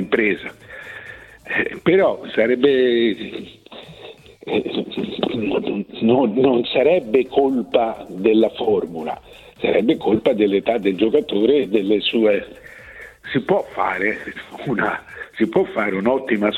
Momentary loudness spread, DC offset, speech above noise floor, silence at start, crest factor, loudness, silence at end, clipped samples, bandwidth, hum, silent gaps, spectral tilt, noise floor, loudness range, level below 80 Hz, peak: 19 LU; under 0.1%; 22 dB; 0 s; 16 dB; -19 LUFS; 0 s; under 0.1%; 9.6 kHz; none; none; -7 dB/octave; -41 dBFS; 4 LU; -54 dBFS; -2 dBFS